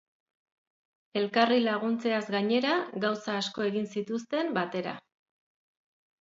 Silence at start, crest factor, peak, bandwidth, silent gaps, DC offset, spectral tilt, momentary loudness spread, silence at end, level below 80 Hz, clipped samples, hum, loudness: 1.15 s; 22 dB; -8 dBFS; 7.8 kHz; none; under 0.1%; -5 dB/octave; 9 LU; 1.2 s; -78 dBFS; under 0.1%; none; -29 LUFS